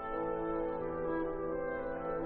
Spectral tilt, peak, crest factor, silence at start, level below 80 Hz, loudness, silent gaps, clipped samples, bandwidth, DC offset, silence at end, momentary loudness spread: -6.5 dB/octave; -24 dBFS; 12 dB; 0 s; -52 dBFS; -37 LUFS; none; under 0.1%; 4.2 kHz; under 0.1%; 0 s; 2 LU